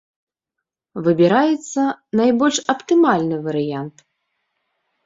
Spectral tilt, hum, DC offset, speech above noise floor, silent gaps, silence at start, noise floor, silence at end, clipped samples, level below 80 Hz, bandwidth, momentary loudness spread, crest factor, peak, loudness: -5 dB/octave; none; under 0.1%; 65 dB; none; 0.95 s; -82 dBFS; 1.15 s; under 0.1%; -64 dBFS; 7.8 kHz; 10 LU; 16 dB; -2 dBFS; -18 LUFS